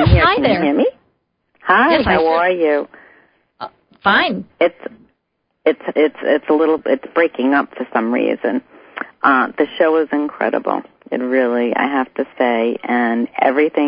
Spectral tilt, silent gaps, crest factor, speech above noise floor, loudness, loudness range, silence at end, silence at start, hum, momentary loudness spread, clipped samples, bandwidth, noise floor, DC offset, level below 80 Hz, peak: -11.5 dB/octave; none; 16 dB; 55 dB; -16 LUFS; 2 LU; 0 s; 0 s; none; 12 LU; under 0.1%; 5.2 kHz; -70 dBFS; under 0.1%; -34 dBFS; 0 dBFS